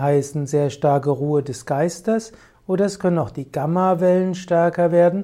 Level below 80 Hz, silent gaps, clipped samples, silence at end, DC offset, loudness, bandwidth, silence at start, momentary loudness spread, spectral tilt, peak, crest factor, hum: -56 dBFS; none; under 0.1%; 0 s; under 0.1%; -20 LUFS; 13.5 kHz; 0 s; 8 LU; -7 dB/octave; -6 dBFS; 14 dB; none